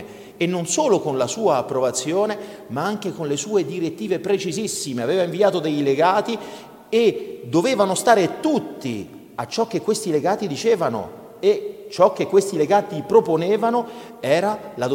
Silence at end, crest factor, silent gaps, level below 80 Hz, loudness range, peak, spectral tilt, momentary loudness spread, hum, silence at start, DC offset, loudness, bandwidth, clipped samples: 0 s; 18 dB; none; -64 dBFS; 3 LU; -2 dBFS; -4.5 dB/octave; 12 LU; none; 0 s; under 0.1%; -21 LUFS; 17 kHz; under 0.1%